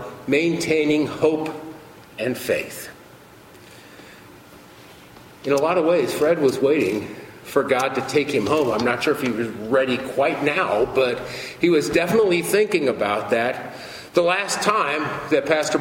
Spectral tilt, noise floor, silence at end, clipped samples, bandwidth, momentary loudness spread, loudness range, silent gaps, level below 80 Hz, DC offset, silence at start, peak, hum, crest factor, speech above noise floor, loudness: -4.5 dB/octave; -46 dBFS; 0 s; under 0.1%; 16.5 kHz; 12 LU; 10 LU; none; -56 dBFS; under 0.1%; 0 s; -4 dBFS; none; 18 dB; 25 dB; -21 LUFS